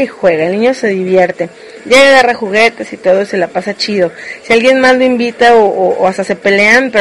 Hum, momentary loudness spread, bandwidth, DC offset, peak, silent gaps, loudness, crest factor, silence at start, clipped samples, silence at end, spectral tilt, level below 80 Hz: none; 9 LU; 12 kHz; under 0.1%; 0 dBFS; none; -9 LUFS; 10 dB; 0 s; 0.6%; 0 s; -4 dB/octave; -48 dBFS